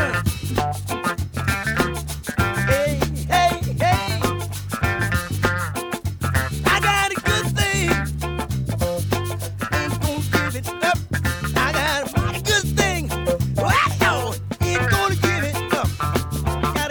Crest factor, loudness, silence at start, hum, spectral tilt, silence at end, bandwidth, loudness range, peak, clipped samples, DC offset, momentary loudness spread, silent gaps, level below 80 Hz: 18 dB; -21 LUFS; 0 s; none; -4.5 dB/octave; 0 s; over 20 kHz; 3 LU; -4 dBFS; under 0.1%; under 0.1%; 7 LU; none; -34 dBFS